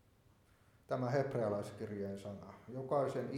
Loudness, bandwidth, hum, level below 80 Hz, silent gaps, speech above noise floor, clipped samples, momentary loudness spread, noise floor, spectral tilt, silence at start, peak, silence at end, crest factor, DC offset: -40 LUFS; 15.5 kHz; none; -74 dBFS; none; 30 dB; under 0.1%; 13 LU; -69 dBFS; -7.5 dB/octave; 0.9 s; -22 dBFS; 0 s; 18 dB; under 0.1%